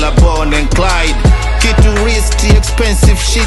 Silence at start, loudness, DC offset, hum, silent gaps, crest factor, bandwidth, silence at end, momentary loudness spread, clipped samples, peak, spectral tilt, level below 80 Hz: 0 s; -11 LUFS; under 0.1%; none; none; 8 dB; 12.5 kHz; 0 s; 2 LU; under 0.1%; 0 dBFS; -4.5 dB/octave; -10 dBFS